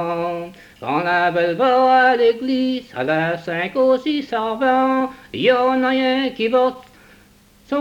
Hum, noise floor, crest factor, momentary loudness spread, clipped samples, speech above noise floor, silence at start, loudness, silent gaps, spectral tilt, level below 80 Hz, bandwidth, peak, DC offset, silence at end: none; -51 dBFS; 14 dB; 10 LU; under 0.1%; 33 dB; 0 s; -18 LUFS; none; -6 dB/octave; -58 dBFS; 8.8 kHz; -4 dBFS; under 0.1%; 0 s